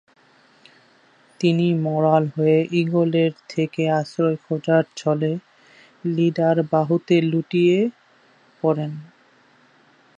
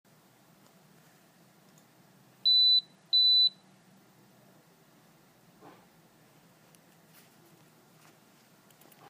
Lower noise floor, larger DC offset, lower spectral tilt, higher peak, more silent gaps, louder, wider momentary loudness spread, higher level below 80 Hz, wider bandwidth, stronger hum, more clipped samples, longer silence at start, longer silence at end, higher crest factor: second, -56 dBFS vs -62 dBFS; neither; first, -7.5 dB/octave vs -1 dB/octave; first, -4 dBFS vs -18 dBFS; neither; about the same, -21 LUFS vs -22 LUFS; about the same, 7 LU vs 7 LU; first, -70 dBFS vs -90 dBFS; second, 8 kHz vs 15.5 kHz; neither; neither; second, 1.4 s vs 2.45 s; second, 1.15 s vs 5.6 s; about the same, 18 dB vs 16 dB